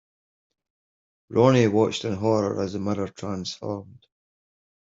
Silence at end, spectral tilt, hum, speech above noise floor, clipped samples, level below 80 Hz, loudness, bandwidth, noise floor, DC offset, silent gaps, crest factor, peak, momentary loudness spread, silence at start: 0.9 s; -6.5 dB/octave; none; over 67 dB; under 0.1%; -64 dBFS; -24 LUFS; 7.8 kHz; under -90 dBFS; under 0.1%; none; 22 dB; -4 dBFS; 13 LU; 1.3 s